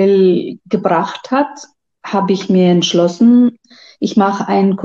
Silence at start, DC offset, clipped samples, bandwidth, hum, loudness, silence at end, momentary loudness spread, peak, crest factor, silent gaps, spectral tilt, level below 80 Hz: 0 s; under 0.1%; under 0.1%; 7.4 kHz; none; -14 LUFS; 0 s; 10 LU; 0 dBFS; 12 dB; none; -6.5 dB/octave; -60 dBFS